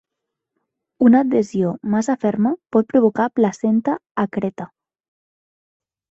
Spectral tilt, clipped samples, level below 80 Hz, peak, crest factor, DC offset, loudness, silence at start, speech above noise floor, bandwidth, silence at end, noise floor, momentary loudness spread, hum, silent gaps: -7.5 dB/octave; under 0.1%; -60 dBFS; -2 dBFS; 18 dB; under 0.1%; -19 LUFS; 1 s; 64 dB; 7.8 kHz; 1.45 s; -81 dBFS; 9 LU; none; 4.11-4.15 s